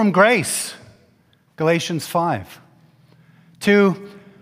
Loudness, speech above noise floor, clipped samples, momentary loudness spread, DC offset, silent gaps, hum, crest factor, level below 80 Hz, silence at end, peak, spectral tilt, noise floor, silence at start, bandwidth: -19 LUFS; 40 dB; under 0.1%; 12 LU; under 0.1%; none; none; 20 dB; -64 dBFS; 0.25 s; 0 dBFS; -4.5 dB/octave; -58 dBFS; 0 s; 16 kHz